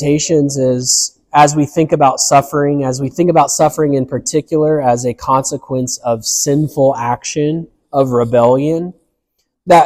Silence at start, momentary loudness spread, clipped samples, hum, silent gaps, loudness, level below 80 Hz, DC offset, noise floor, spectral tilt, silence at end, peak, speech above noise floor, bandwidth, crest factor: 0 s; 7 LU; under 0.1%; none; none; -13 LUFS; -48 dBFS; under 0.1%; -68 dBFS; -4.5 dB/octave; 0 s; 0 dBFS; 55 dB; 15.5 kHz; 14 dB